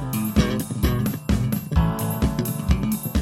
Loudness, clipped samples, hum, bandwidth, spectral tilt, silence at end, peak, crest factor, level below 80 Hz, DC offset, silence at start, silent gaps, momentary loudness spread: -23 LUFS; under 0.1%; none; 16.5 kHz; -6 dB/octave; 0 s; -6 dBFS; 16 dB; -28 dBFS; under 0.1%; 0 s; none; 2 LU